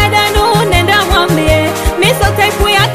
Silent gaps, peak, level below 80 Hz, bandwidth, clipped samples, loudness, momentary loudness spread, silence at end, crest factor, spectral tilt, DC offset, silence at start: none; 0 dBFS; -20 dBFS; 16 kHz; under 0.1%; -10 LUFS; 2 LU; 0 s; 10 dB; -4 dB/octave; 0.8%; 0 s